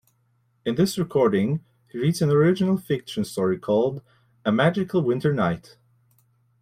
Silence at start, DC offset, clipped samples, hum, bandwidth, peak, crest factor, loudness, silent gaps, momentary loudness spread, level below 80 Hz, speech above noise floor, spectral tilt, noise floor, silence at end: 0.65 s; under 0.1%; under 0.1%; none; 16 kHz; -6 dBFS; 18 dB; -23 LUFS; none; 10 LU; -60 dBFS; 44 dB; -7 dB/octave; -66 dBFS; 1.05 s